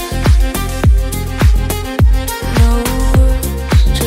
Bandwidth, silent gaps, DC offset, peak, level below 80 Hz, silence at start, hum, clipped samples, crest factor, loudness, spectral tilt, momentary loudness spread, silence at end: 16.5 kHz; none; under 0.1%; 0 dBFS; -12 dBFS; 0 s; none; under 0.1%; 10 dB; -14 LUFS; -5.5 dB/octave; 5 LU; 0 s